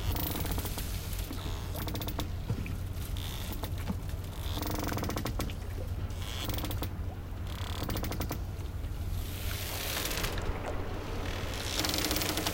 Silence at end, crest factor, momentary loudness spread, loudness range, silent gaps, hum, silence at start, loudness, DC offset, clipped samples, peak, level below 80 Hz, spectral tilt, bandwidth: 0 s; 26 dB; 7 LU; 3 LU; none; none; 0 s; -35 LUFS; under 0.1%; under 0.1%; -8 dBFS; -40 dBFS; -4 dB/octave; 17 kHz